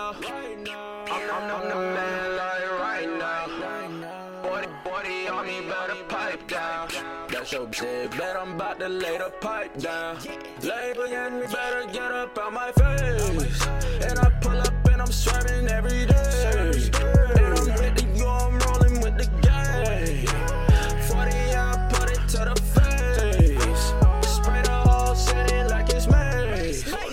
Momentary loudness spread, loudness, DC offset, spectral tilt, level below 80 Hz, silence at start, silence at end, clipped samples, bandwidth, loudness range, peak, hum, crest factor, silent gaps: 11 LU; -24 LUFS; under 0.1%; -5 dB/octave; -24 dBFS; 0 s; 0 s; under 0.1%; 16 kHz; 8 LU; -6 dBFS; none; 16 dB; none